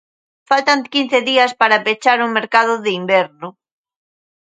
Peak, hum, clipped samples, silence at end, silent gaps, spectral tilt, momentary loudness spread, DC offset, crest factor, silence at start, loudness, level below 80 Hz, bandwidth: 0 dBFS; none; under 0.1%; 0.9 s; none; -3.5 dB/octave; 6 LU; under 0.1%; 16 dB; 0.5 s; -15 LUFS; -70 dBFS; 9.4 kHz